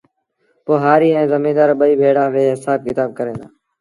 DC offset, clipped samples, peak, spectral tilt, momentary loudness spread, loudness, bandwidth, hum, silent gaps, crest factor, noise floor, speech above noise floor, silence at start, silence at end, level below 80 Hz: under 0.1%; under 0.1%; 0 dBFS; -7.5 dB/octave; 12 LU; -15 LUFS; 11.5 kHz; none; none; 16 dB; -64 dBFS; 50 dB; 0.65 s; 0.35 s; -60 dBFS